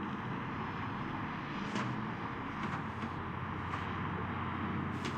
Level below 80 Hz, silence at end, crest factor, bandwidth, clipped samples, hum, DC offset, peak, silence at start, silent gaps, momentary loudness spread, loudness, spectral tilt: -58 dBFS; 0 s; 14 dB; 10 kHz; under 0.1%; none; under 0.1%; -24 dBFS; 0 s; none; 3 LU; -39 LUFS; -6.5 dB/octave